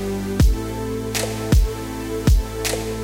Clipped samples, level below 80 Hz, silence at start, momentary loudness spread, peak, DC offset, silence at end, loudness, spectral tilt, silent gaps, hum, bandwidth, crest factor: under 0.1%; -22 dBFS; 0 s; 7 LU; -6 dBFS; under 0.1%; 0 s; -22 LUFS; -5.5 dB/octave; none; none; 17 kHz; 14 dB